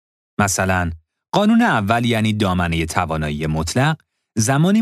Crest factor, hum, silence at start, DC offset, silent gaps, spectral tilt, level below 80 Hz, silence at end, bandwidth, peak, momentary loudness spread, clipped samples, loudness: 16 dB; none; 0.4 s; under 0.1%; none; -5 dB/octave; -38 dBFS; 0 s; 14.5 kHz; -2 dBFS; 10 LU; under 0.1%; -18 LUFS